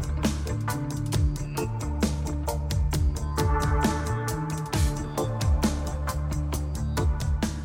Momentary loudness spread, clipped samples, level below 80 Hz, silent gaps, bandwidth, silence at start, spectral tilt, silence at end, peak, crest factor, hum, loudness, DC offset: 5 LU; under 0.1%; -30 dBFS; none; 17 kHz; 0 s; -5.5 dB/octave; 0 s; -12 dBFS; 14 dB; none; -28 LUFS; under 0.1%